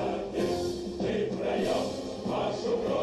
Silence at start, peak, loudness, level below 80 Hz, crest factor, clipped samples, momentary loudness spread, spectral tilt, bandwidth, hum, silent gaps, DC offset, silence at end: 0 s; -18 dBFS; -31 LUFS; -52 dBFS; 12 dB; under 0.1%; 4 LU; -5.5 dB/octave; 13 kHz; none; none; under 0.1%; 0 s